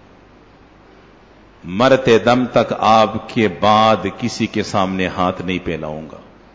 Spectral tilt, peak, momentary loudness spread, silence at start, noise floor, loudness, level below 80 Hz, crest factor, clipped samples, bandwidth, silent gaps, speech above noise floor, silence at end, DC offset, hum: -5.5 dB/octave; -2 dBFS; 12 LU; 1.65 s; -46 dBFS; -16 LUFS; -44 dBFS; 16 dB; under 0.1%; 8 kHz; none; 30 dB; 0.35 s; under 0.1%; none